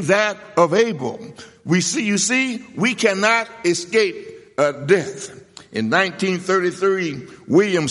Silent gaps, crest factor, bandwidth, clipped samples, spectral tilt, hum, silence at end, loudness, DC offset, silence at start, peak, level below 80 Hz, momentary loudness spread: none; 18 dB; 11.5 kHz; under 0.1%; -4 dB/octave; none; 0 s; -19 LUFS; under 0.1%; 0 s; -2 dBFS; -64 dBFS; 14 LU